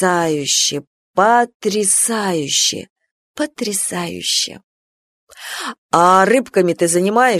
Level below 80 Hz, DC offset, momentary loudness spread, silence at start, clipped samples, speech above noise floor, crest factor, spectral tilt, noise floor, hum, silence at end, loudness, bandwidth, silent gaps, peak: -62 dBFS; under 0.1%; 13 LU; 0 s; under 0.1%; over 74 dB; 16 dB; -2.5 dB/octave; under -90 dBFS; none; 0 s; -16 LUFS; 13.5 kHz; 0.87-1.14 s, 1.54-1.60 s, 2.90-2.96 s, 3.11-3.34 s, 4.64-5.27 s, 5.78-5.89 s; 0 dBFS